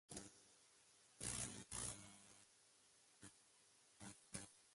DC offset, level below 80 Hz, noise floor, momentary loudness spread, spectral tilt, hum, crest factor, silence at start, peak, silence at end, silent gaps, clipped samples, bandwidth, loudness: under 0.1%; -72 dBFS; -74 dBFS; 21 LU; -2 dB/octave; none; 26 dB; 0.1 s; -32 dBFS; 0 s; none; under 0.1%; 11.5 kHz; -52 LUFS